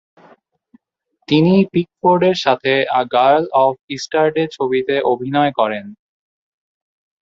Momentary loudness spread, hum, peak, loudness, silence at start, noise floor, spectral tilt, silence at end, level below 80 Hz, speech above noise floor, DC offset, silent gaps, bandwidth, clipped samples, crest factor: 6 LU; none; -2 dBFS; -16 LUFS; 1.3 s; -69 dBFS; -6.5 dB/octave; 1.3 s; -60 dBFS; 54 dB; under 0.1%; 3.81-3.88 s; 7.8 kHz; under 0.1%; 16 dB